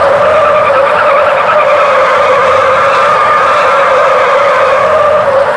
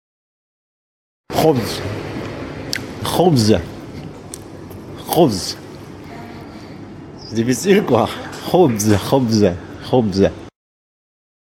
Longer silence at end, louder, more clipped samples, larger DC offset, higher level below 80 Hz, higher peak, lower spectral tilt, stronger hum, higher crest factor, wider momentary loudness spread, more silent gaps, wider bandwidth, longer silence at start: second, 0 s vs 0.95 s; first, -7 LUFS vs -17 LUFS; neither; neither; about the same, -44 dBFS vs -46 dBFS; about the same, 0 dBFS vs 0 dBFS; second, -3.5 dB/octave vs -5.5 dB/octave; neither; second, 6 dB vs 18 dB; second, 1 LU vs 20 LU; neither; second, 11 kHz vs 17 kHz; second, 0 s vs 1.3 s